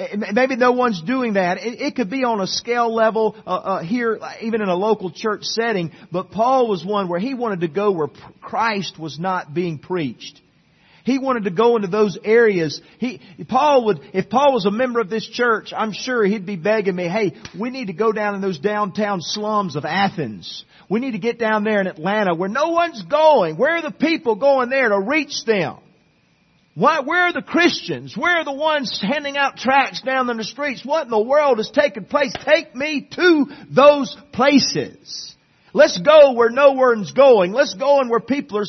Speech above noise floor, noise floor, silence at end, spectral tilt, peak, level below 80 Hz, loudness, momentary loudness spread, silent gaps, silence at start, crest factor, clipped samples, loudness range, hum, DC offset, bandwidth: 40 dB; -59 dBFS; 0 s; -5 dB/octave; 0 dBFS; -64 dBFS; -18 LUFS; 11 LU; none; 0 s; 18 dB; under 0.1%; 6 LU; none; under 0.1%; 6.4 kHz